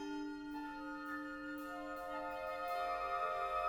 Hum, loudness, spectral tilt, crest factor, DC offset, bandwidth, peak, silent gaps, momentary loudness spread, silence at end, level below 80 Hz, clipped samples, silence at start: none; -43 LUFS; -4.5 dB/octave; 16 dB; under 0.1%; over 20 kHz; -26 dBFS; none; 7 LU; 0 s; -66 dBFS; under 0.1%; 0 s